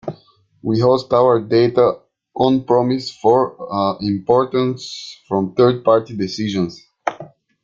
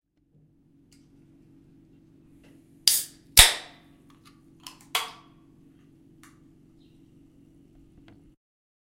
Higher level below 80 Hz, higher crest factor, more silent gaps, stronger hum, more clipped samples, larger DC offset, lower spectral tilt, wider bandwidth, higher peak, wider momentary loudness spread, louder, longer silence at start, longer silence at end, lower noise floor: second, -56 dBFS vs -42 dBFS; second, 16 dB vs 30 dB; neither; neither; neither; neither; first, -7 dB/octave vs 0.5 dB/octave; second, 7.6 kHz vs 16 kHz; about the same, -2 dBFS vs 0 dBFS; second, 13 LU vs 31 LU; first, -17 LUFS vs -20 LUFS; second, 0.05 s vs 2.85 s; second, 0.35 s vs 3.85 s; second, -51 dBFS vs -63 dBFS